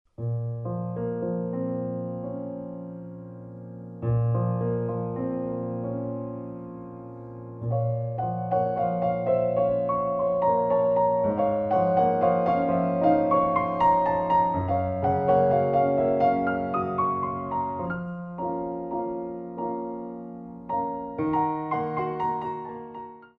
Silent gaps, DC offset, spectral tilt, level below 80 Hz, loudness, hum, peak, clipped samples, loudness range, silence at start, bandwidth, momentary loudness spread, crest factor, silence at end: none; under 0.1%; -11 dB/octave; -56 dBFS; -26 LUFS; none; -10 dBFS; under 0.1%; 9 LU; 0.2 s; 4.8 kHz; 16 LU; 16 dB; 0.1 s